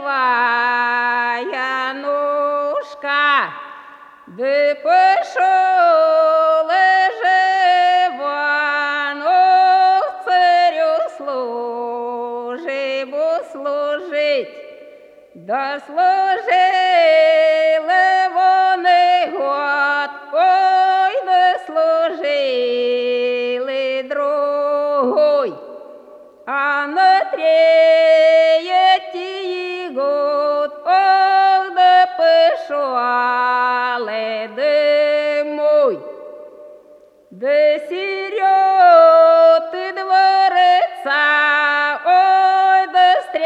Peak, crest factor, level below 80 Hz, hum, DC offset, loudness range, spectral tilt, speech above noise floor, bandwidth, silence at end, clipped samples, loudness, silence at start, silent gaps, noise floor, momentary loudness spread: 0 dBFS; 16 dB; -76 dBFS; none; under 0.1%; 6 LU; -2.5 dB/octave; 32 dB; 8.4 kHz; 0 s; under 0.1%; -15 LUFS; 0 s; none; -47 dBFS; 11 LU